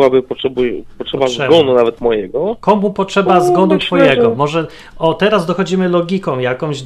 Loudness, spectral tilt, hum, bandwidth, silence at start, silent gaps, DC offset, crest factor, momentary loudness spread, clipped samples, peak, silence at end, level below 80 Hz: -13 LUFS; -6 dB/octave; none; 13 kHz; 0 s; none; under 0.1%; 14 dB; 8 LU; under 0.1%; 0 dBFS; 0 s; -44 dBFS